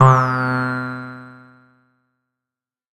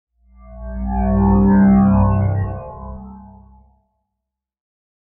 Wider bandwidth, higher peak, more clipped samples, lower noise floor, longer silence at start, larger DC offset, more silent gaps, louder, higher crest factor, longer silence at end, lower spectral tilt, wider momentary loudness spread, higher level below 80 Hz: first, 8.2 kHz vs 2.8 kHz; first, 0 dBFS vs -4 dBFS; neither; first, -88 dBFS vs -81 dBFS; second, 0 s vs 0.45 s; neither; neither; second, -19 LUFS vs -15 LUFS; first, 20 dB vs 14 dB; second, 1.6 s vs 1.9 s; second, -8 dB/octave vs -13 dB/octave; about the same, 20 LU vs 22 LU; second, -54 dBFS vs -28 dBFS